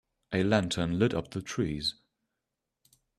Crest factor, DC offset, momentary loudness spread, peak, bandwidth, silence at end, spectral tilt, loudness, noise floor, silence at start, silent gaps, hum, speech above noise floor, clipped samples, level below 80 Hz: 22 dB; under 0.1%; 8 LU; -10 dBFS; 13.5 kHz; 1.25 s; -5.5 dB/octave; -30 LUFS; -86 dBFS; 0.3 s; none; none; 57 dB; under 0.1%; -56 dBFS